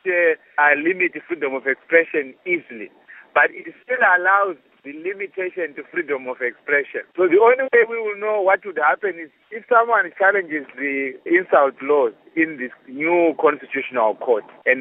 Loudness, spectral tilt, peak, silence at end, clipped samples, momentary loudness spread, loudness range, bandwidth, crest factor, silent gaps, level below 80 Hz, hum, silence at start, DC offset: -19 LUFS; -8.5 dB/octave; 0 dBFS; 0 s; under 0.1%; 13 LU; 2 LU; 3.9 kHz; 20 dB; none; -82 dBFS; none; 0.05 s; under 0.1%